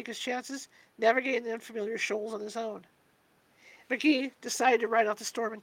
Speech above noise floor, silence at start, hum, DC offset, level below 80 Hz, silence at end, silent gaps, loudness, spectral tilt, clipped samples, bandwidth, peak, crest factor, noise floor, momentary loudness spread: 37 dB; 0 s; none; under 0.1%; -84 dBFS; 0 s; none; -30 LUFS; -2.5 dB/octave; under 0.1%; 16.5 kHz; -10 dBFS; 20 dB; -67 dBFS; 13 LU